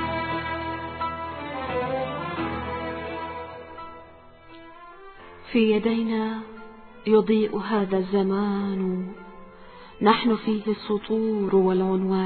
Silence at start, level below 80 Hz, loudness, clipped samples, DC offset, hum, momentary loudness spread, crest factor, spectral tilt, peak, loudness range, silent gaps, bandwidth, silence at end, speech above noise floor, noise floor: 0 s; -54 dBFS; -25 LUFS; under 0.1%; under 0.1%; none; 24 LU; 20 dB; -10.5 dB/octave; -4 dBFS; 8 LU; none; 4.5 kHz; 0 s; 25 dB; -48 dBFS